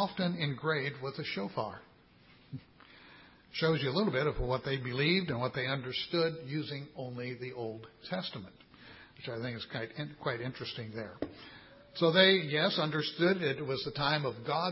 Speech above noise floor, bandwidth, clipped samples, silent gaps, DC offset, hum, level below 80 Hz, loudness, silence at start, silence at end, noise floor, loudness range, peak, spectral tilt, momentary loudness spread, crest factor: 28 dB; 5.8 kHz; under 0.1%; none; under 0.1%; none; -58 dBFS; -33 LUFS; 0 s; 0 s; -61 dBFS; 11 LU; -12 dBFS; -9 dB/octave; 17 LU; 22 dB